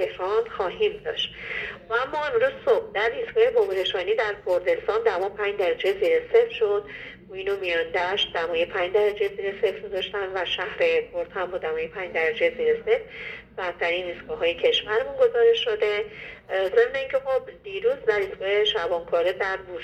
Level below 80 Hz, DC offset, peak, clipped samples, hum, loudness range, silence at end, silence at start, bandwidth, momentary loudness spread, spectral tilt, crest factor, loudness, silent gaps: -56 dBFS; under 0.1%; -6 dBFS; under 0.1%; none; 3 LU; 0 s; 0 s; 8.4 kHz; 8 LU; -4 dB/octave; 18 dB; -24 LUFS; none